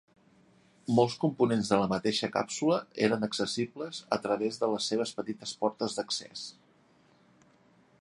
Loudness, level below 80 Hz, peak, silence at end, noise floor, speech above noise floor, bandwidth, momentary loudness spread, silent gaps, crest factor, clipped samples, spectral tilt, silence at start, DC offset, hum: -30 LUFS; -68 dBFS; -10 dBFS; 1.5 s; -64 dBFS; 34 dB; 11.5 kHz; 10 LU; none; 22 dB; under 0.1%; -4.5 dB/octave; 0.9 s; under 0.1%; none